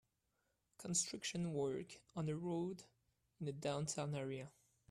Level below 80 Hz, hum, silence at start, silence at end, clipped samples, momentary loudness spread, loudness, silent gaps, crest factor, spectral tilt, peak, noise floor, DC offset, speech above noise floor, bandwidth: -78 dBFS; none; 0.8 s; 0.4 s; under 0.1%; 12 LU; -43 LUFS; none; 22 dB; -4.5 dB/octave; -22 dBFS; -85 dBFS; under 0.1%; 42 dB; 14 kHz